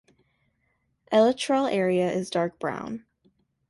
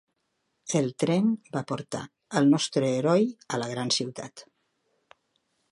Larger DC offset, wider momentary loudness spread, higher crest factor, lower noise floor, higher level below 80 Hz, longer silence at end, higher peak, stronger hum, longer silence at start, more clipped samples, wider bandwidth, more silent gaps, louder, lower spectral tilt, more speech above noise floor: neither; about the same, 13 LU vs 14 LU; about the same, 18 dB vs 20 dB; second, -72 dBFS vs -77 dBFS; first, -68 dBFS vs -74 dBFS; second, 0.7 s vs 1.3 s; about the same, -8 dBFS vs -8 dBFS; neither; first, 1.1 s vs 0.65 s; neither; about the same, 11.5 kHz vs 11.5 kHz; neither; about the same, -25 LUFS vs -27 LUFS; about the same, -5.5 dB/octave vs -5 dB/octave; about the same, 48 dB vs 51 dB